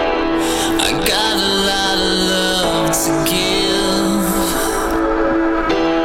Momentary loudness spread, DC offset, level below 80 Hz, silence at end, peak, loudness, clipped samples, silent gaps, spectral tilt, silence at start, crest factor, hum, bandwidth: 3 LU; under 0.1%; -32 dBFS; 0 s; -4 dBFS; -15 LUFS; under 0.1%; none; -3 dB/octave; 0 s; 12 dB; none; 17.5 kHz